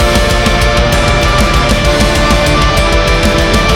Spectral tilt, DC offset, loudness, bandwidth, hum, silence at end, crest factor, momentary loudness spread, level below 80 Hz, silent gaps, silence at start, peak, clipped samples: -4.5 dB/octave; 0.4%; -10 LUFS; 17 kHz; none; 0 s; 8 dB; 1 LU; -14 dBFS; none; 0 s; 0 dBFS; under 0.1%